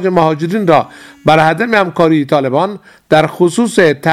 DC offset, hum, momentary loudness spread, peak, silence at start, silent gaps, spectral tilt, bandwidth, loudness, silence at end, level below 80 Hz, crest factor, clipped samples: under 0.1%; none; 6 LU; 0 dBFS; 0 s; none; -6 dB/octave; 15 kHz; -12 LUFS; 0 s; -50 dBFS; 12 dB; 0.2%